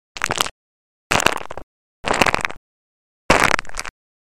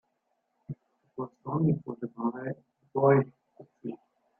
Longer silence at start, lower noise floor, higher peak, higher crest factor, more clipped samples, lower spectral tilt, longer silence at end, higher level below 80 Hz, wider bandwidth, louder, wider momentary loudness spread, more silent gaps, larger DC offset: second, 0.15 s vs 0.7 s; first, under -90 dBFS vs -78 dBFS; first, 0 dBFS vs -10 dBFS; about the same, 22 dB vs 22 dB; neither; second, -2.5 dB/octave vs -13 dB/octave; second, 0.3 s vs 0.45 s; first, -40 dBFS vs -72 dBFS; first, 17 kHz vs 2.8 kHz; first, -19 LUFS vs -30 LUFS; second, 16 LU vs 21 LU; first, 0.51-1.10 s, 1.63-2.03 s, 2.57-3.29 s vs none; first, 2% vs under 0.1%